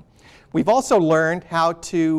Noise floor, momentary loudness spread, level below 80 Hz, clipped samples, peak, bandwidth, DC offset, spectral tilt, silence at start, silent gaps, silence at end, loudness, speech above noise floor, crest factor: -49 dBFS; 6 LU; -54 dBFS; under 0.1%; -8 dBFS; 14 kHz; under 0.1%; -5.5 dB/octave; 0.55 s; none; 0 s; -19 LUFS; 31 dB; 12 dB